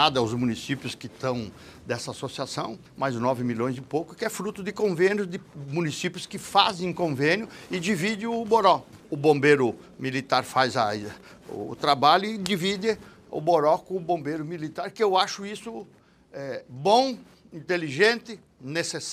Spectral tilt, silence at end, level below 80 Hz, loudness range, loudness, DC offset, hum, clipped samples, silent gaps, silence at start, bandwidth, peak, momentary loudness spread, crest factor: -4.5 dB/octave; 0 s; -62 dBFS; 6 LU; -26 LUFS; under 0.1%; none; under 0.1%; none; 0 s; 15 kHz; -4 dBFS; 15 LU; 22 dB